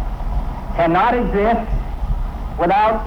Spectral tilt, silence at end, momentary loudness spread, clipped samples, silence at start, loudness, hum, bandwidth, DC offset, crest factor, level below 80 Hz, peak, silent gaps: -8 dB/octave; 0 s; 11 LU; under 0.1%; 0 s; -19 LUFS; none; 6.2 kHz; under 0.1%; 10 dB; -24 dBFS; -6 dBFS; none